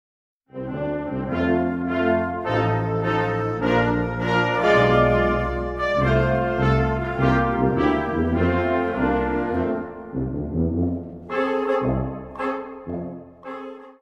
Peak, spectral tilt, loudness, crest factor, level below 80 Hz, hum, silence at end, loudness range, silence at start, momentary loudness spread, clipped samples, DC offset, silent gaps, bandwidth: -6 dBFS; -8 dB/octave; -22 LUFS; 16 dB; -36 dBFS; none; 0.1 s; 6 LU; 0.55 s; 12 LU; under 0.1%; under 0.1%; none; 8 kHz